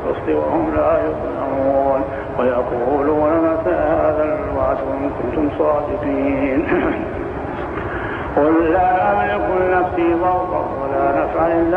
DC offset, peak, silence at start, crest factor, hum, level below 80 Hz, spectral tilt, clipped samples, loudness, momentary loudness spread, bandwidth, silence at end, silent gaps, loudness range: under 0.1%; -4 dBFS; 0 s; 14 dB; none; -36 dBFS; -9 dB/octave; under 0.1%; -18 LUFS; 8 LU; 5.4 kHz; 0 s; none; 3 LU